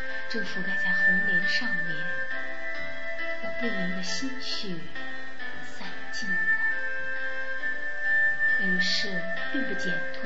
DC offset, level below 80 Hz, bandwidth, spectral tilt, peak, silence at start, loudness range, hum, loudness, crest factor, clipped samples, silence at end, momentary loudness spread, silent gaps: 4%; -62 dBFS; 8 kHz; -3.5 dB/octave; -12 dBFS; 0 s; 7 LU; none; -28 LUFS; 16 dB; under 0.1%; 0 s; 14 LU; none